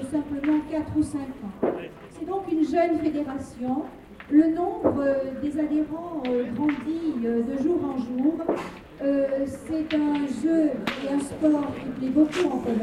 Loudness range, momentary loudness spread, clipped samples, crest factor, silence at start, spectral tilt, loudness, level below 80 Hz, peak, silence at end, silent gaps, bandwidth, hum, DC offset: 2 LU; 9 LU; under 0.1%; 18 dB; 0 s; -6.5 dB/octave; -26 LUFS; -54 dBFS; -8 dBFS; 0 s; none; 11 kHz; none; under 0.1%